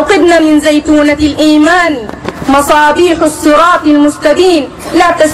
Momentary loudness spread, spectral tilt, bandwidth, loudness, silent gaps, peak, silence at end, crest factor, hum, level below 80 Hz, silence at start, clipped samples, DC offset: 7 LU; -4 dB/octave; 15 kHz; -7 LUFS; none; 0 dBFS; 0 s; 8 dB; none; -34 dBFS; 0 s; 0.8%; under 0.1%